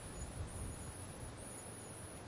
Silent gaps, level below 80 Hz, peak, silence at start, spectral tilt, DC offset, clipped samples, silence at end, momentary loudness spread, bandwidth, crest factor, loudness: none; -56 dBFS; -34 dBFS; 0 s; -4.5 dB/octave; under 0.1%; under 0.1%; 0 s; 3 LU; 11.5 kHz; 14 dB; -48 LUFS